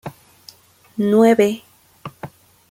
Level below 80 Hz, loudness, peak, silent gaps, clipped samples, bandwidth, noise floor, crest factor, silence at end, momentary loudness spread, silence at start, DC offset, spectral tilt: -62 dBFS; -16 LUFS; -2 dBFS; none; under 0.1%; 16 kHz; -47 dBFS; 18 dB; 0.45 s; 25 LU; 0.05 s; under 0.1%; -6.5 dB/octave